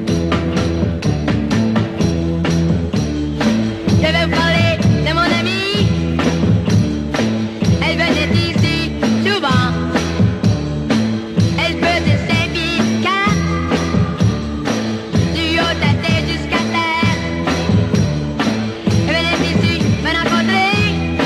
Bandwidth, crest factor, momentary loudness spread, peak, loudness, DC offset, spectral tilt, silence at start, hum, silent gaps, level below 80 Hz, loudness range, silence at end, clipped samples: 12.5 kHz; 12 dB; 4 LU; -4 dBFS; -16 LUFS; under 0.1%; -6 dB/octave; 0 s; none; none; -30 dBFS; 2 LU; 0 s; under 0.1%